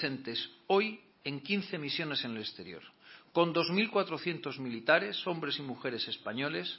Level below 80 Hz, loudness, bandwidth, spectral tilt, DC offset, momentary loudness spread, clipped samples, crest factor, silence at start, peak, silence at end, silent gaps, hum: -80 dBFS; -33 LUFS; 5.8 kHz; -8.5 dB/octave; under 0.1%; 12 LU; under 0.1%; 22 dB; 0 s; -12 dBFS; 0 s; none; none